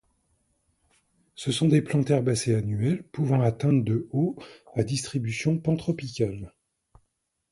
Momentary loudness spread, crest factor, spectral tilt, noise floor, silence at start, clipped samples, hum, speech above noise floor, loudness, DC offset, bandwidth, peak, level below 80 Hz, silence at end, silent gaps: 8 LU; 18 dB; -6.5 dB/octave; -76 dBFS; 1.4 s; under 0.1%; none; 51 dB; -26 LUFS; under 0.1%; 11.5 kHz; -8 dBFS; -56 dBFS; 1.05 s; none